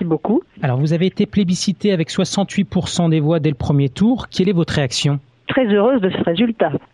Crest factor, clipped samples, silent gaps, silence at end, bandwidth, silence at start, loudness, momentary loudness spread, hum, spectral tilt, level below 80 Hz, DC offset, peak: 16 dB; under 0.1%; none; 0.15 s; 11.5 kHz; 0 s; -17 LUFS; 4 LU; none; -6 dB/octave; -44 dBFS; under 0.1%; -2 dBFS